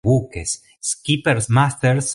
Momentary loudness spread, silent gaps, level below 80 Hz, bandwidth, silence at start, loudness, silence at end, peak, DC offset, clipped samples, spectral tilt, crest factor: 9 LU; none; -44 dBFS; 11.5 kHz; 0.05 s; -19 LUFS; 0 s; -4 dBFS; under 0.1%; under 0.1%; -4.5 dB/octave; 16 dB